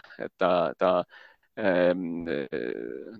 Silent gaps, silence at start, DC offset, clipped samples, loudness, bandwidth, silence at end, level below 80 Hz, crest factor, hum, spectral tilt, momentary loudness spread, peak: none; 0.1 s; under 0.1%; under 0.1%; -27 LUFS; 5.4 kHz; 0 s; -62 dBFS; 20 dB; none; -8 dB/octave; 14 LU; -8 dBFS